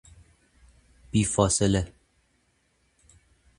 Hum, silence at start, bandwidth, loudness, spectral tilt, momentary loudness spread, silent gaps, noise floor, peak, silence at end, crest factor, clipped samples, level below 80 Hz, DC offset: none; 1.15 s; 11.5 kHz; -25 LUFS; -5 dB/octave; 7 LU; none; -69 dBFS; -6 dBFS; 1.7 s; 24 dB; under 0.1%; -46 dBFS; under 0.1%